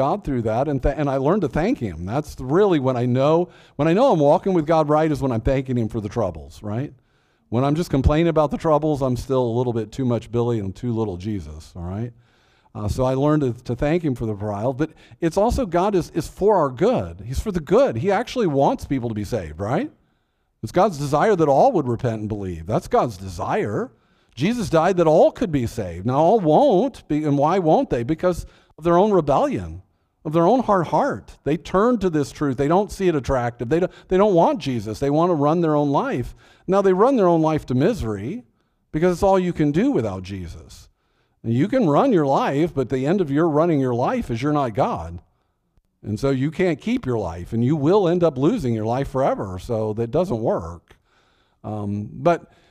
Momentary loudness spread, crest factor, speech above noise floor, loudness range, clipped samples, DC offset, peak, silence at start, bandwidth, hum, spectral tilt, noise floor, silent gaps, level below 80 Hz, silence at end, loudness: 12 LU; 16 dB; 48 dB; 5 LU; under 0.1%; under 0.1%; -4 dBFS; 0 s; 15 kHz; none; -7.5 dB/octave; -68 dBFS; none; -40 dBFS; 0.3 s; -21 LUFS